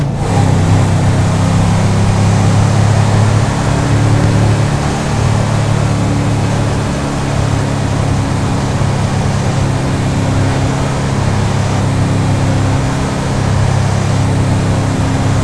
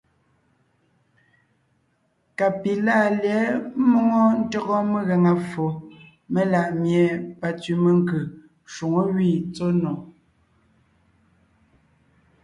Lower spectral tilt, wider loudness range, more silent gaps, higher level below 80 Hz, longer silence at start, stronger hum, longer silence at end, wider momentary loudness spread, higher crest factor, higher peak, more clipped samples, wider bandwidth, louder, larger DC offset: second, -6.5 dB/octave vs -8 dB/octave; second, 3 LU vs 6 LU; neither; first, -24 dBFS vs -62 dBFS; second, 0 s vs 2.4 s; neither; second, 0 s vs 2.35 s; second, 4 LU vs 10 LU; about the same, 12 dB vs 16 dB; first, 0 dBFS vs -8 dBFS; neither; about the same, 11 kHz vs 11 kHz; first, -13 LUFS vs -22 LUFS; neither